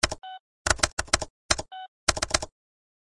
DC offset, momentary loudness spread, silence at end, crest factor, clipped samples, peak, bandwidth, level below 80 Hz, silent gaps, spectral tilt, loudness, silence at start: under 0.1%; 16 LU; 0.65 s; 28 dB; under 0.1%; -2 dBFS; 11.5 kHz; -42 dBFS; 0.40-0.65 s, 0.93-0.97 s, 1.30-1.49 s, 1.88-2.07 s; -1.5 dB/octave; -26 LUFS; 0.05 s